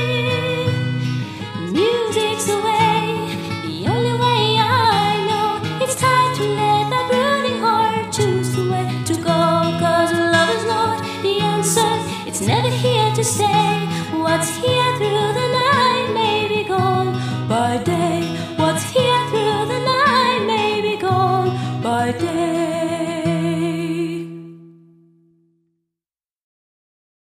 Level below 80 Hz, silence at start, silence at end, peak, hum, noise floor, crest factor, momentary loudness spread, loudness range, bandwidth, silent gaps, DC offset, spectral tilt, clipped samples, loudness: -56 dBFS; 0 s; 2.65 s; -2 dBFS; none; under -90 dBFS; 16 dB; 7 LU; 4 LU; 15.5 kHz; none; under 0.1%; -4.5 dB/octave; under 0.1%; -18 LUFS